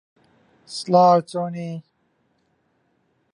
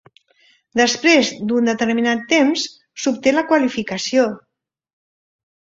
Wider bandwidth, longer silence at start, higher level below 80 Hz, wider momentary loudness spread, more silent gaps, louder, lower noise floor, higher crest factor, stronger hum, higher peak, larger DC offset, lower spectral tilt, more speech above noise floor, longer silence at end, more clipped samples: first, 11 kHz vs 7.8 kHz; about the same, 0.7 s vs 0.75 s; second, -72 dBFS vs -60 dBFS; first, 19 LU vs 9 LU; neither; about the same, -19 LUFS vs -17 LUFS; first, -67 dBFS vs -57 dBFS; about the same, 20 dB vs 18 dB; neither; about the same, -4 dBFS vs -2 dBFS; neither; first, -6.5 dB/octave vs -3 dB/octave; first, 48 dB vs 40 dB; first, 1.55 s vs 1.35 s; neither